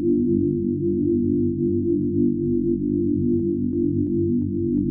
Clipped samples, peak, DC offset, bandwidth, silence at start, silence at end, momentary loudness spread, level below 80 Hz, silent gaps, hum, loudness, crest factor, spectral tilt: under 0.1%; -10 dBFS; under 0.1%; 0.7 kHz; 0 s; 0 s; 2 LU; -44 dBFS; none; 50 Hz at -40 dBFS; -22 LUFS; 12 dB; -17.5 dB/octave